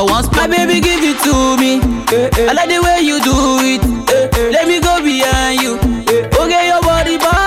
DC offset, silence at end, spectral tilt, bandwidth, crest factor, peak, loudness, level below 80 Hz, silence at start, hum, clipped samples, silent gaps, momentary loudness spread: under 0.1%; 0 s; -4 dB/octave; 17 kHz; 8 dB; -4 dBFS; -12 LUFS; -24 dBFS; 0 s; none; under 0.1%; none; 3 LU